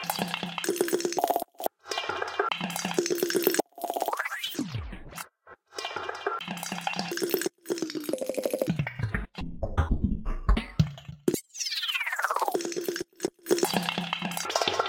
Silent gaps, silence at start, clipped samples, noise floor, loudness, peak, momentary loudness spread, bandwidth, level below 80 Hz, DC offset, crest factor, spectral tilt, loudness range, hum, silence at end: none; 0 s; under 0.1%; -54 dBFS; -30 LUFS; -6 dBFS; 8 LU; 17 kHz; -40 dBFS; under 0.1%; 24 dB; -4 dB/octave; 4 LU; none; 0 s